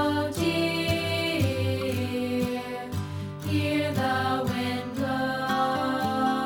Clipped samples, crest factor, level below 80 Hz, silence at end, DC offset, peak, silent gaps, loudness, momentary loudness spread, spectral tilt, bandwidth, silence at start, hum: under 0.1%; 14 dB; -54 dBFS; 0 s; under 0.1%; -12 dBFS; none; -27 LUFS; 7 LU; -5.5 dB/octave; 20 kHz; 0 s; none